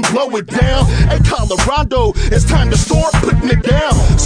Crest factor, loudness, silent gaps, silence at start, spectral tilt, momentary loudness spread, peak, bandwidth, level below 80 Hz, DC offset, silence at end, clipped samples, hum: 12 dB; -13 LUFS; none; 0 s; -5 dB/octave; 2 LU; 0 dBFS; 10 kHz; -16 dBFS; under 0.1%; 0 s; under 0.1%; none